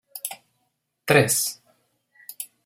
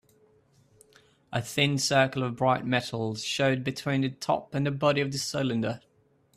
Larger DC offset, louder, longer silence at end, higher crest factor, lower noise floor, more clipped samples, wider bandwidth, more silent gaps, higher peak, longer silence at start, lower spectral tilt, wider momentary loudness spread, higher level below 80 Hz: neither; first, -22 LUFS vs -27 LUFS; second, 0.2 s vs 0.6 s; about the same, 24 dB vs 20 dB; first, -75 dBFS vs -65 dBFS; neither; first, 16.5 kHz vs 14 kHz; neither; first, -2 dBFS vs -8 dBFS; second, 0.15 s vs 1.3 s; about the same, -3.5 dB/octave vs -4.5 dB/octave; first, 25 LU vs 8 LU; about the same, -62 dBFS vs -64 dBFS